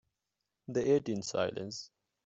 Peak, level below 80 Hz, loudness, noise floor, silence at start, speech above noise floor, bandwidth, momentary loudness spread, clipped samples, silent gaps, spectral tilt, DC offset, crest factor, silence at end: -16 dBFS; -72 dBFS; -34 LUFS; -87 dBFS; 0.7 s; 54 dB; 8 kHz; 19 LU; under 0.1%; none; -5 dB/octave; under 0.1%; 18 dB; 0.4 s